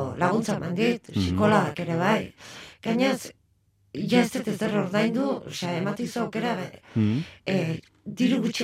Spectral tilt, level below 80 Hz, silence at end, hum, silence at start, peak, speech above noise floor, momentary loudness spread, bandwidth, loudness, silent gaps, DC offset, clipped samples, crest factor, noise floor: -6 dB/octave; -62 dBFS; 0 s; none; 0 s; -6 dBFS; 40 dB; 11 LU; 15.5 kHz; -26 LUFS; none; under 0.1%; under 0.1%; 18 dB; -65 dBFS